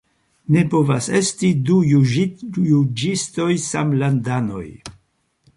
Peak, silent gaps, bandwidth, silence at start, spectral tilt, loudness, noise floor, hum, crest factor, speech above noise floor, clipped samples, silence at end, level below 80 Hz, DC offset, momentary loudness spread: -4 dBFS; none; 11.5 kHz; 0.5 s; -6 dB/octave; -18 LUFS; -65 dBFS; none; 14 dB; 47 dB; under 0.1%; 0.65 s; -54 dBFS; under 0.1%; 9 LU